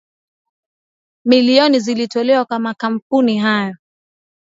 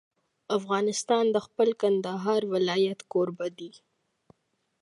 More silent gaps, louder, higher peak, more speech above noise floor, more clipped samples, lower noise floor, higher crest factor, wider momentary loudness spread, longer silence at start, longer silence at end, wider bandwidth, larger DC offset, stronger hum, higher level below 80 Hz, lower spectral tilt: first, 3.02-3.10 s vs none; first, -15 LUFS vs -27 LUFS; first, 0 dBFS vs -10 dBFS; first, over 76 dB vs 49 dB; neither; first, under -90 dBFS vs -75 dBFS; about the same, 16 dB vs 18 dB; about the same, 10 LU vs 9 LU; first, 1.25 s vs 0.5 s; second, 0.65 s vs 1.05 s; second, 7.8 kHz vs 11.5 kHz; neither; neither; first, -68 dBFS vs -80 dBFS; about the same, -5 dB/octave vs -4.5 dB/octave